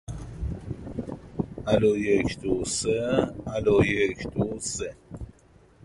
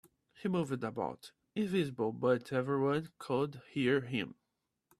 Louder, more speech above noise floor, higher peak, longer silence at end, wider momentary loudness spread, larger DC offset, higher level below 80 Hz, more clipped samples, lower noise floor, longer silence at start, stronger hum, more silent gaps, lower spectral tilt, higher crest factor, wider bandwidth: first, -26 LUFS vs -35 LUFS; second, 31 dB vs 51 dB; first, -8 dBFS vs -18 dBFS; about the same, 0.55 s vs 0.65 s; first, 15 LU vs 9 LU; neither; first, -44 dBFS vs -72 dBFS; neither; second, -56 dBFS vs -85 dBFS; second, 0.1 s vs 0.4 s; neither; neither; second, -5 dB/octave vs -7 dB/octave; about the same, 20 dB vs 18 dB; second, 11.5 kHz vs 13.5 kHz